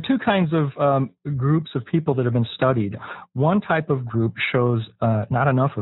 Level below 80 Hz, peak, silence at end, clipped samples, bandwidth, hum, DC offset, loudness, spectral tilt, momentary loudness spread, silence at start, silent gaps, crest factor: -54 dBFS; -6 dBFS; 0 s; under 0.1%; 4.1 kHz; none; under 0.1%; -21 LUFS; -6.5 dB/octave; 5 LU; 0 s; none; 16 dB